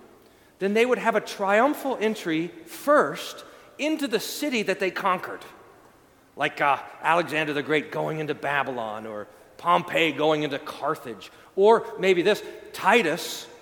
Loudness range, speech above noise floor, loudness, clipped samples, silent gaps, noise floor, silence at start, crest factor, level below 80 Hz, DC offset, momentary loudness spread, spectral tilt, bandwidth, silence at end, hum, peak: 4 LU; 31 dB; -24 LUFS; under 0.1%; none; -56 dBFS; 0.6 s; 20 dB; -70 dBFS; under 0.1%; 14 LU; -4.5 dB/octave; 19 kHz; 0.05 s; none; -4 dBFS